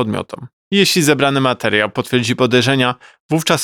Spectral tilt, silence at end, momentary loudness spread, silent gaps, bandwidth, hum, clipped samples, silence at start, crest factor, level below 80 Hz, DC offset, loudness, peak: -4 dB/octave; 0 s; 11 LU; 0.53-0.71 s, 3.20-3.29 s; 20 kHz; none; under 0.1%; 0 s; 14 dB; -58 dBFS; under 0.1%; -15 LUFS; 0 dBFS